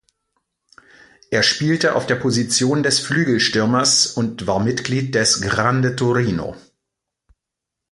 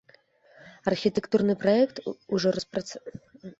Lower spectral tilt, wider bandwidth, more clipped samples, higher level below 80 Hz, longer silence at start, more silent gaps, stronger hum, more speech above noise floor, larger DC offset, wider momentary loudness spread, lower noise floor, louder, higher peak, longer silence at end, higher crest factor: second, -3.5 dB/octave vs -6 dB/octave; first, 11.5 kHz vs 8 kHz; neither; first, -50 dBFS vs -64 dBFS; first, 1.3 s vs 0.65 s; neither; neither; first, 65 dB vs 33 dB; neither; second, 6 LU vs 17 LU; first, -83 dBFS vs -60 dBFS; first, -17 LUFS vs -26 LUFS; first, -2 dBFS vs -10 dBFS; first, 1.35 s vs 0.1 s; about the same, 18 dB vs 18 dB